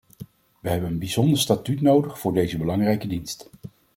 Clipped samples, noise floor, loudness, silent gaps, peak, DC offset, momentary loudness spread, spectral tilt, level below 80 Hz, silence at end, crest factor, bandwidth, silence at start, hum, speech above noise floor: under 0.1%; -44 dBFS; -23 LUFS; none; -4 dBFS; under 0.1%; 14 LU; -6 dB/octave; -52 dBFS; 0.3 s; 20 dB; 16.5 kHz; 0.2 s; none; 22 dB